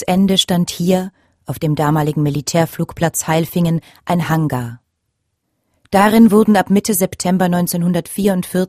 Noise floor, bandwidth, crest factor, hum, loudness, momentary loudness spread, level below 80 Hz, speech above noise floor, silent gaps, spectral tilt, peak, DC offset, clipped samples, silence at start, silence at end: -71 dBFS; 15.5 kHz; 16 dB; none; -15 LUFS; 9 LU; -48 dBFS; 56 dB; none; -5.5 dB/octave; 0 dBFS; under 0.1%; under 0.1%; 0 s; 0 s